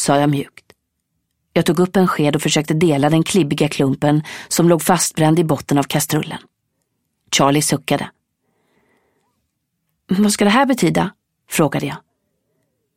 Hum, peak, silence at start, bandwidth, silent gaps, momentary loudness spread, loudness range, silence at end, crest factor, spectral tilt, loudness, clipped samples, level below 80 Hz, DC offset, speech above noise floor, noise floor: none; 0 dBFS; 0 s; 16.5 kHz; none; 9 LU; 5 LU; 1 s; 18 dB; -5 dB/octave; -17 LUFS; under 0.1%; -54 dBFS; under 0.1%; 57 dB; -72 dBFS